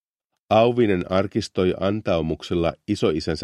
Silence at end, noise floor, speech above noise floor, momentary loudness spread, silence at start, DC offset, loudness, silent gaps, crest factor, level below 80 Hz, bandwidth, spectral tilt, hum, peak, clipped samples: 0 s; -81 dBFS; 60 dB; 6 LU; 0.5 s; under 0.1%; -22 LUFS; none; 18 dB; -46 dBFS; 11.5 kHz; -6.5 dB/octave; none; -4 dBFS; under 0.1%